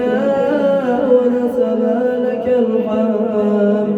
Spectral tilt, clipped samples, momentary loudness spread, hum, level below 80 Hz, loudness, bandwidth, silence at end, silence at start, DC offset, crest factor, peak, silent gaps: -8.5 dB/octave; under 0.1%; 3 LU; none; -54 dBFS; -15 LUFS; 7.6 kHz; 0 s; 0 s; under 0.1%; 14 dB; -2 dBFS; none